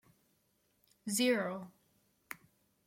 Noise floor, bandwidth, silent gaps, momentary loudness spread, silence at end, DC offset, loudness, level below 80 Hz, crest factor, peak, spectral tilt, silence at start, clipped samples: -76 dBFS; 16.5 kHz; none; 20 LU; 0.5 s; under 0.1%; -34 LUFS; -84 dBFS; 20 dB; -18 dBFS; -3 dB/octave; 1.05 s; under 0.1%